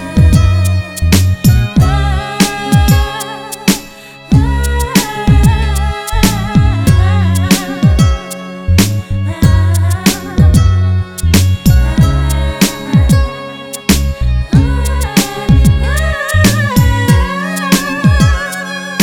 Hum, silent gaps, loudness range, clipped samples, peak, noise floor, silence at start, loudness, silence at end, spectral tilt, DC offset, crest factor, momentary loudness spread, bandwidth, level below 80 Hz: none; none; 2 LU; 0.4%; 0 dBFS; -32 dBFS; 0 s; -12 LUFS; 0 s; -5.5 dB/octave; under 0.1%; 10 dB; 7 LU; 19.5 kHz; -16 dBFS